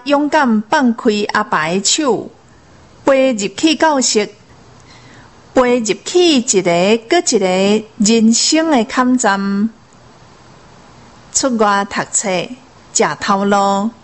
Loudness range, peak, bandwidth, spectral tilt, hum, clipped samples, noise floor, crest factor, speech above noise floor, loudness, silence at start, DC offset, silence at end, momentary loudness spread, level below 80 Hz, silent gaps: 5 LU; 0 dBFS; 8.6 kHz; -3 dB/octave; none; under 0.1%; -44 dBFS; 14 dB; 31 dB; -14 LUFS; 0.05 s; 0.2%; 0.1 s; 7 LU; -52 dBFS; none